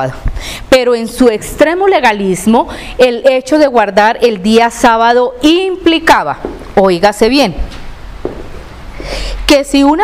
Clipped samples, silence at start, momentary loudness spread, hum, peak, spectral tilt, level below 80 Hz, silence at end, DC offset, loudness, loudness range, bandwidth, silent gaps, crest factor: 0.9%; 0 s; 16 LU; none; 0 dBFS; -4.5 dB/octave; -26 dBFS; 0 s; 0.4%; -10 LUFS; 4 LU; 16 kHz; none; 10 dB